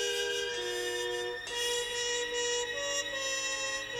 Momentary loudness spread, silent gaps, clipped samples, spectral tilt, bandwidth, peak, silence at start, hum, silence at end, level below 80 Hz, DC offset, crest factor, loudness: 3 LU; none; under 0.1%; 0 dB/octave; over 20 kHz; -20 dBFS; 0 s; 50 Hz at -65 dBFS; 0 s; -64 dBFS; under 0.1%; 14 dB; -32 LUFS